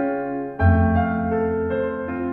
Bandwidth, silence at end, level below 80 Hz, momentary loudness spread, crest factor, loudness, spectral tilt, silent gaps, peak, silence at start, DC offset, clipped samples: 3.8 kHz; 0 s; -34 dBFS; 8 LU; 16 dB; -22 LUFS; -11.5 dB/octave; none; -6 dBFS; 0 s; under 0.1%; under 0.1%